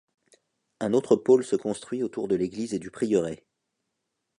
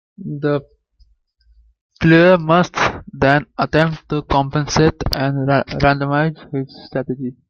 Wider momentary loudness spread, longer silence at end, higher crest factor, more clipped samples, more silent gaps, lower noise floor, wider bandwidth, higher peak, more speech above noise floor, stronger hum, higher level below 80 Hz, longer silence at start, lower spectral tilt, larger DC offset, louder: second, 11 LU vs 14 LU; first, 1.05 s vs 0.15 s; about the same, 20 dB vs 16 dB; neither; second, none vs 1.81-1.90 s; first, -81 dBFS vs -56 dBFS; second, 11 kHz vs 15.5 kHz; second, -8 dBFS vs -2 dBFS; first, 56 dB vs 40 dB; neither; second, -66 dBFS vs -38 dBFS; first, 0.8 s vs 0.2 s; about the same, -6.5 dB/octave vs -6 dB/octave; neither; second, -26 LUFS vs -17 LUFS